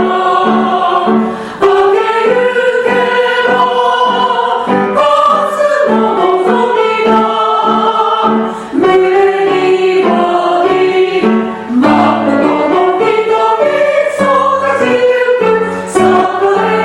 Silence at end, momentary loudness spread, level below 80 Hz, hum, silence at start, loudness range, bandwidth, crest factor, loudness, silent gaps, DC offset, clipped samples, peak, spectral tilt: 0 s; 3 LU; -50 dBFS; none; 0 s; 0 LU; 12 kHz; 10 dB; -10 LUFS; none; under 0.1%; under 0.1%; 0 dBFS; -5.5 dB/octave